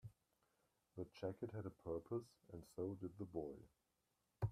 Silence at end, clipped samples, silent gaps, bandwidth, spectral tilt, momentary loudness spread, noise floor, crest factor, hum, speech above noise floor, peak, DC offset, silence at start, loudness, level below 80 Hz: 0 s; under 0.1%; none; 14 kHz; -8.5 dB/octave; 12 LU; -87 dBFS; 20 dB; none; 37 dB; -32 dBFS; under 0.1%; 0.05 s; -51 LUFS; -74 dBFS